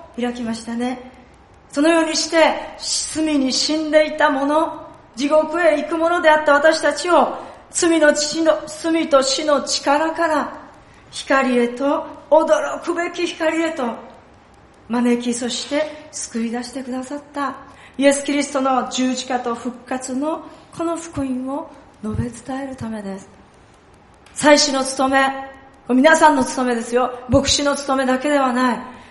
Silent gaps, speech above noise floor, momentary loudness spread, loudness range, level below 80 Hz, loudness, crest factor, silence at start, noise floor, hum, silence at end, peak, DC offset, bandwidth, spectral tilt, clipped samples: none; 30 dB; 14 LU; 8 LU; -50 dBFS; -18 LUFS; 20 dB; 0 s; -48 dBFS; none; 0.05 s; 0 dBFS; under 0.1%; 11.5 kHz; -3 dB/octave; under 0.1%